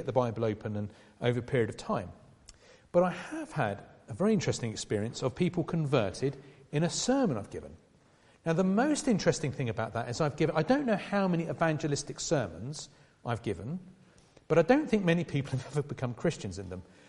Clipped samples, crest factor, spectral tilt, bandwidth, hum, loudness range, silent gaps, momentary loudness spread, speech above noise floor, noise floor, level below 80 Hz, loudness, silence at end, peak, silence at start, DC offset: under 0.1%; 20 dB; -6 dB/octave; 11.5 kHz; none; 3 LU; none; 13 LU; 32 dB; -62 dBFS; -58 dBFS; -31 LUFS; 0.25 s; -10 dBFS; 0 s; under 0.1%